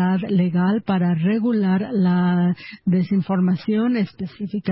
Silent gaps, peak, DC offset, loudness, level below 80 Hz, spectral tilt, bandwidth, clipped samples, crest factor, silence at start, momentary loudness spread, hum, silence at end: none; -8 dBFS; under 0.1%; -20 LUFS; -58 dBFS; -13 dB/octave; 5.8 kHz; under 0.1%; 10 dB; 0 s; 7 LU; none; 0 s